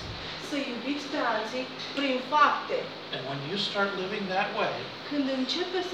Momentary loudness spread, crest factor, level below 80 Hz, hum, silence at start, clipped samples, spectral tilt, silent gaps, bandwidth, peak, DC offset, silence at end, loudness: 10 LU; 20 dB; -60 dBFS; none; 0 s; under 0.1%; -4.5 dB/octave; none; 13 kHz; -10 dBFS; under 0.1%; 0 s; -29 LUFS